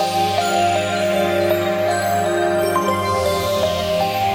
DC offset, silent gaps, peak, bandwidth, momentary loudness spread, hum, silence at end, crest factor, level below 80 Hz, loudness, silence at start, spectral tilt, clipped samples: under 0.1%; none; -6 dBFS; 16.5 kHz; 2 LU; none; 0 s; 12 dB; -52 dBFS; -18 LUFS; 0 s; -4.5 dB/octave; under 0.1%